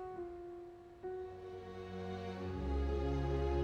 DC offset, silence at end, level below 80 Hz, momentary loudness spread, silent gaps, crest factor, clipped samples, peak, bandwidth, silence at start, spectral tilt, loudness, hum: under 0.1%; 0 s; -44 dBFS; 13 LU; none; 14 dB; under 0.1%; -26 dBFS; 6.8 kHz; 0 s; -8 dB/octave; -42 LUFS; none